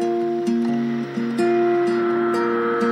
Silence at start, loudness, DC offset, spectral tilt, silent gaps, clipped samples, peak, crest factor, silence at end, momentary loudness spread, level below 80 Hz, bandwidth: 0 s; -21 LUFS; under 0.1%; -6.5 dB/octave; none; under 0.1%; -10 dBFS; 10 dB; 0 s; 5 LU; -70 dBFS; 10.5 kHz